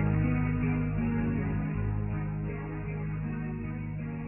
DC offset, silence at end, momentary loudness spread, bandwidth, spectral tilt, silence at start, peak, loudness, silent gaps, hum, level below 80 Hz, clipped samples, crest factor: under 0.1%; 0 s; 8 LU; 3 kHz; -12.5 dB/octave; 0 s; -16 dBFS; -32 LUFS; none; none; -40 dBFS; under 0.1%; 14 dB